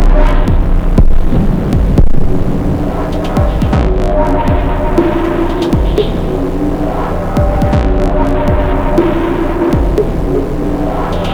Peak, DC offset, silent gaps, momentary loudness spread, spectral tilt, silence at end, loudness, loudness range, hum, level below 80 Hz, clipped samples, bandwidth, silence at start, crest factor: 0 dBFS; under 0.1%; none; 4 LU; -8 dB/octave; 0 s; -13 LUFS; 1 LU; none; -12 dBFS; under 0.1%; 8.6 kHz; 0 s; 10 dB